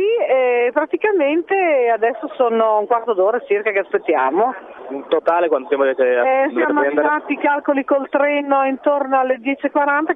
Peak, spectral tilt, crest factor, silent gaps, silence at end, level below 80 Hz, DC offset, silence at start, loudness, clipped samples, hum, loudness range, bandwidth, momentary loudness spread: -4 dBFS; -7 dB/octave; 14 dB; none; 0 s; -70 dBFS; under 0.1%; 0 s; -17 LUFS; under 0.1%; none; 1 LU; 3.9 kHz; 4 LU